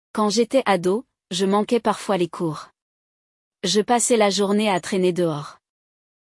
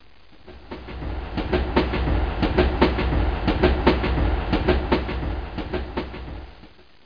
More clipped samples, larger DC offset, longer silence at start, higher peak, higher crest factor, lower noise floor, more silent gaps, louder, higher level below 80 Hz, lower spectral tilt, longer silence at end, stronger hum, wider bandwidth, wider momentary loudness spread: neither; second, under 0.1% vs 0.4%; second, 0.15 s vs 0.45 s; about the same, -6 dBFS vs -4 dBFS; about the same, 16 dB vs 20 dB; first, under -90 dBFS vs -49 dBFS; first, 2.82-3.51 s vs none; about the same, -21 LUFS vs -23 LUFS; second, -66 dBFS vs -28 dBFS; second, -4 dB/octave vs -8.5 dB/octave; first, 0.85 s vs 0.4 s; neither; first, 12 kHz vs 5.2 kHz; second, 10 LU vs 16 LU